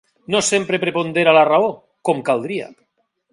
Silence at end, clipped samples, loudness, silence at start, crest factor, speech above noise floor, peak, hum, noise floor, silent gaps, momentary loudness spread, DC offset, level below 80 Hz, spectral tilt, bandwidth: 0.6 s; under 0.1%; -17 LUFS; 0.3 s; 18 dB; 51 dB; 0 dBFS; none; -68 dBFS; none; 13 LU; under 0.1%; -64 dBFS; -3.5 dB/octave; 11.5 kHz